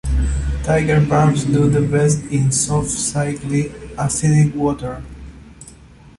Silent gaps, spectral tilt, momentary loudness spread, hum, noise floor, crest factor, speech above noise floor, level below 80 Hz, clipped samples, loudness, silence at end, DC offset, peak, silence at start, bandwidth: none; -6 dB/octave; 11 LU; none; -43 dBFS; 14 dB; 26 dB; -28 dBFS; under 0.1%; -17 LUFS; 0.5 s; under 0.1%; -2 dBFS; 0.05 s; 11.5 kHz